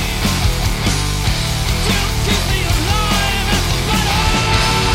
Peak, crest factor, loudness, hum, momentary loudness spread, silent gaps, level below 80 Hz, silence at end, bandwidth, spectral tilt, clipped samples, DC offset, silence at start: -2 dBFS; 14 dB; -16 LUFS; none; 3 LU; none; -20 dBFS; 0 s; 16.5 kHz; -3.5 dB/octave; under 0.1%; under 0.1%; 0 s